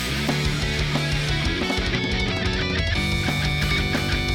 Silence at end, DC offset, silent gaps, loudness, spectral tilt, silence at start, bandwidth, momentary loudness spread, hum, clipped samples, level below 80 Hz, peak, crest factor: 0 s; under 0.1%; none; -23 LUFS; -4.5 dB/octave; 0 s; 18 kHz; 1 LU; none; under 0.1%; -30 dBFS; -8 dBFS; 14 dB